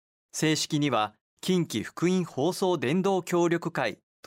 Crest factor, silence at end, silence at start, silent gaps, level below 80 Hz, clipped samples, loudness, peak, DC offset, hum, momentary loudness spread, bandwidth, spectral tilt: 16 dB; 0.3 s; 0.35 s; 1.21-1.37 s; -70 dBFS; under 0.1%; -27 LUFS; -12 dBFS; under 0.1%; none; 6 LU; 16 kHz; -5 dB/octave